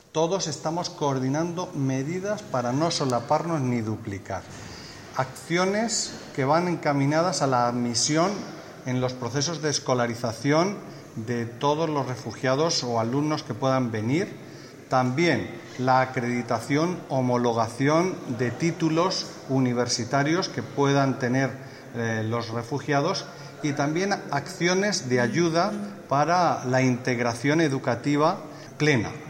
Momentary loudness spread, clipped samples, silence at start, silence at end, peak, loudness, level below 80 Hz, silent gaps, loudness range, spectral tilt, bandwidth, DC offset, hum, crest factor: 9 LU; under 0.1%; 0.15 s; 0 s; -6 dBFS; -25 LUFS; -64 dBFS; none; 3 LU; -5 dB/octave; 16 kHz; under 0.1%; none; 20 dB